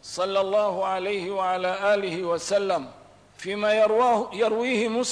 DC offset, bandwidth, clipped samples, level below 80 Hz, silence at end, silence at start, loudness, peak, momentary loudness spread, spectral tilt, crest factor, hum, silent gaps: under 0.1%; 11 kHz; under 0.1%; -68 dBFS; 0 s; 0.05 s; -24 LUFS; -12 dBFS; 7 LU; -3.5 dB/octave; 12 dB; 50 Hz at -60 dBFS; none